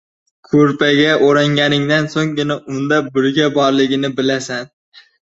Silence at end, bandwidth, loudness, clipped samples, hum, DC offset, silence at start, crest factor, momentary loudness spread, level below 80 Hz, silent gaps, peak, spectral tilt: 0.55 s; 8 kHz; -15 LUFS; under 0.1%; none; under 0.1%; 0.5 s; 14 dB; 8 LU; -56 dBFS; none; 0 dBFS; -5.5 dB/octave